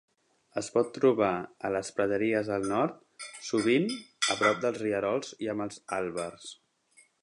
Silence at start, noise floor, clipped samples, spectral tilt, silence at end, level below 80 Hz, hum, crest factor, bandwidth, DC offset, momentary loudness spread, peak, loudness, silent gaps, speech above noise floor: 0.55 s; -64 dBFS; under 0.1%; -4 dB/octave; 0.7 s; -68 dBFS; none; 20 dB; 11.5 kHz; under 0.1%; 13 LU; -10 dBFS; -29 LUFS; none; 35 dB